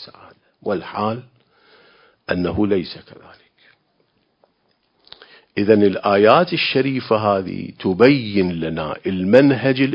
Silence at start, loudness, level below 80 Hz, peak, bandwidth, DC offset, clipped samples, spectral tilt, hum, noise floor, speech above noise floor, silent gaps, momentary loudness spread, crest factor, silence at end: 0 s; -18 LUFS; -48 dBFS; 0 dBFS; 6.8 kHz; under 0.1%; under 0.1%; -8.5 dB/octave; none; -65 dBFS; 48 dB; none; 15 LU; 20 dB; 0 s